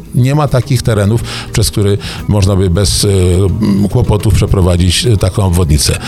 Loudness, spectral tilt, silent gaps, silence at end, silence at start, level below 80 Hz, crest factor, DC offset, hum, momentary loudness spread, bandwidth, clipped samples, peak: -11 LUFS; -5.5 dB/octave; none; 0 s; 0 s; -22 dBFS; 10 dB; under 0.1%; none; 4 LU; 15 kHz; under 0.1%; 0 dBFS